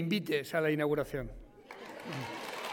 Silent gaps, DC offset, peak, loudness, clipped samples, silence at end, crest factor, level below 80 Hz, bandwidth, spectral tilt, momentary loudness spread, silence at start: none; under 0.1%; -18 dBFS; -34 LUFS; under 0.1%; 0 s; 16 dB; -56 dBFS; 17 kHz; -5.5 dB/octave; 18 LU; 0 s